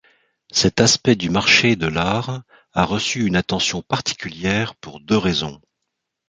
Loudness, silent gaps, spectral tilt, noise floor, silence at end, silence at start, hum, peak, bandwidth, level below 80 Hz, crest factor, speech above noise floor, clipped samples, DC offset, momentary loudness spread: -18 LUFS; none; -3.5 dB/octave; -78 dBFS; 0.75 s; 0.55 s; none; 0 dBFS; 9.6 kHz; -44 dBFS; 20 dB; 59 dB; under 0.1%; under 0.1%; 13 LU